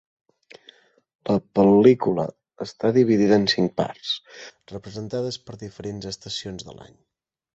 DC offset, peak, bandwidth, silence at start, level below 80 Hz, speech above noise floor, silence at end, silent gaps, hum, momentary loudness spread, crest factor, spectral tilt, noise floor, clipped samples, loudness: under 0.1%; -2 dBFS; 8 kHz; 1.25 s; -58 dBFS; 32 dB; 0.75 s; none; none; 21 LU; 20 dB; -6 dB/octave; -54 dBFS; under 0.1%; -21 LUFS